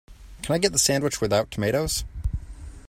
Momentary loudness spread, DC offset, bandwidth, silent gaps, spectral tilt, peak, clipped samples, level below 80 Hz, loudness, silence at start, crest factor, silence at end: 15 LU; under 0.1%; 16 kHz; none; -3.5 dB/octave; -8 dBFS; under 0.1%; -36 dBFS; -24 LUFS; 0.1 s; 18 dB; 0 s